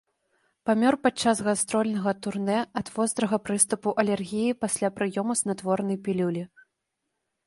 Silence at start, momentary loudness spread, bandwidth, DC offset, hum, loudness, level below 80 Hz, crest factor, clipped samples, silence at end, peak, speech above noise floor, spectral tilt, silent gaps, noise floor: 0.65 s; 6 LU; 11.5 kHz; under 0.1%; none; -26 LUFS; -66 dBFS; 22 dB; under 0.1%; 1 s; -6 dBFS; 55 dB; -4.5 dB/octave; none; -81 dBFS